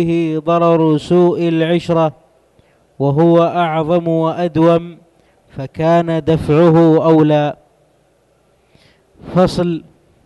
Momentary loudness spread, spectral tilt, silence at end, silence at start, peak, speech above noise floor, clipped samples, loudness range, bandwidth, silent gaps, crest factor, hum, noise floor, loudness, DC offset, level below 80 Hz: 9 LU; -8.5 dB/octave; 0.45 s; 0 s; -2 dBFS; 43 dB; under 0.1%; 2 LU; 10.5 kHz; none; 14 dB; none; -56 dBFS; -14 LUFS; under 0.1%; -44 dBFS